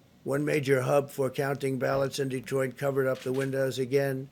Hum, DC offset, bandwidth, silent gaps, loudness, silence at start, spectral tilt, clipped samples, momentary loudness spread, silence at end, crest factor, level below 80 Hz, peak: none; under 0.1%; 17.5 kHz; none; -29 LUFS; 0.25 s; -6 dB/octave; under 0.1%; 5 LU; 0.05 s; 18 dB; -66 dBFS; -10 dBFS